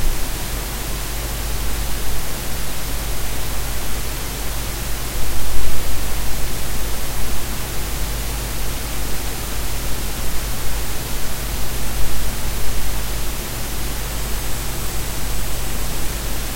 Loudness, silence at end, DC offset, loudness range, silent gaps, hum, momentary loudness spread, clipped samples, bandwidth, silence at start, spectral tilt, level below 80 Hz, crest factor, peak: -25 LUFS; 0 s; under 0.1%; 0 LU; none; none; 1 LU; under 0.1%; 16 kHz; 0 s; -3 dB/octave; -26 dBFS; 16 dB; 0 dBFS